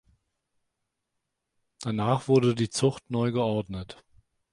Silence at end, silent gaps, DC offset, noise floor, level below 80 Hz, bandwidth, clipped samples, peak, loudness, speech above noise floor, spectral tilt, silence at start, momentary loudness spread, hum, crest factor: 0.6 s; none; under 0.1%; -82 dBFS; -58 dBFS; 11.5 kHz; under 0.1%; -10 dBFS; -26 LUFS; 56 dB; -6 dB/octave; 1.8 s; 15 LU; none; 20 dB